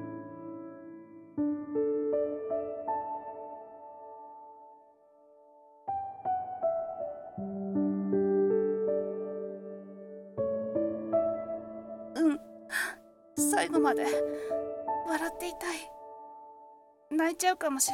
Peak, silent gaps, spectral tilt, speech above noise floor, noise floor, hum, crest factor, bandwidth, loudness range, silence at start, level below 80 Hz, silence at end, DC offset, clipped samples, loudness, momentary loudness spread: -12 dBFS; none; -4 dB/octave; 31 dB; -60 dBFS; none; 20 dB; 17.5 kHz; 8 LU; 0 s; -70 dBFS; 0 s; under 0.1%; under 0.1%; -32 LUFS; 20 LU